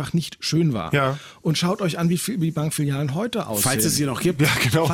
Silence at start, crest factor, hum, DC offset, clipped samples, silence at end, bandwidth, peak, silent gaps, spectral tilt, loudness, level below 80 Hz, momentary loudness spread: 0 s; 14 dB; none; under 0.1%; under 0.1%; 0 s; 16.5 kHz; -8 dBFS; none; -4.5 dB/octave; -22 LUFS; -52 dBFS; 6 LU